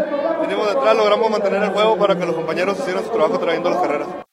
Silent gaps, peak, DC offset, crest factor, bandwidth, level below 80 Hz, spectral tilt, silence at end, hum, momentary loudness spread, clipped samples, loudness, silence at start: none; -2 dBFS; under 0.1%; 16 dB; 13 kHz; -62 dBFS; -5.5 dB/octave; 0.1 s; none; 6 LU; under 0.1%; -18 LUFS; 0 s